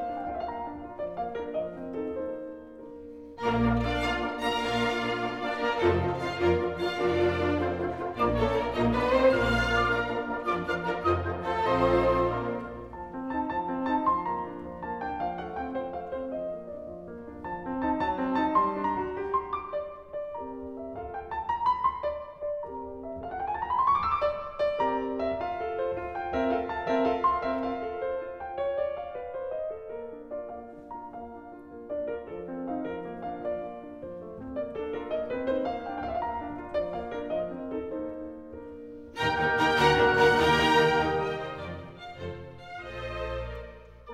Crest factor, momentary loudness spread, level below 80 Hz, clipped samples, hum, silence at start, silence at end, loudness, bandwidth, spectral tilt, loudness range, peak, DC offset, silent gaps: 20 dB; 16 LU; -48 dBFS; under 0.1%; none; 0 s; 0 s; -29 LUFS; 15 kHz; -6 dB/octave; 11 LU; -10 dBFS; under 0.1%; none